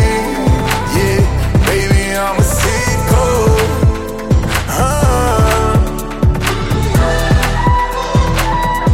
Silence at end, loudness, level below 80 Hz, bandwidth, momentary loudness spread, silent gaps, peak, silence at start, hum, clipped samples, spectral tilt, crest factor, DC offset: 0 s; -13 LUFS; -18 dBFS; 16.5 kHz; 3 LU; none; -2 dBFS; 0 s; none; under 0.1%; -5.5 dB/octave; 10 dB; under 0.1%